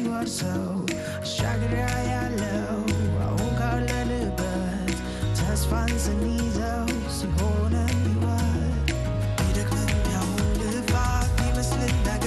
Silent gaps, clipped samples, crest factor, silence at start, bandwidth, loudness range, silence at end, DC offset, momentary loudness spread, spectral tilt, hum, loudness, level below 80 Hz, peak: none; under 0.1%; 18 dB; 0 s; 12.5 kHz; 2 LU; 0 s; under 0.1%; 3 LU; -5.5 dB/octave; none; -26 LUFS; -30 dBFS; -8 dBFS